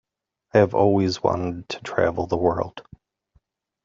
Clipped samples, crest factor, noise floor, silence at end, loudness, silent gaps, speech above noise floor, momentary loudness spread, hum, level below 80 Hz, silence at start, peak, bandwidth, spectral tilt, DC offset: under 0.1%; 20 dB; -72 dBFS; 1.05 s; -22 LUFS; none; 51 dB; 12 LU; none; -54 dBFS; 0.55 s; -4 dBFS; 7.6 kHz; -5.5 dB/octave; under 0.1%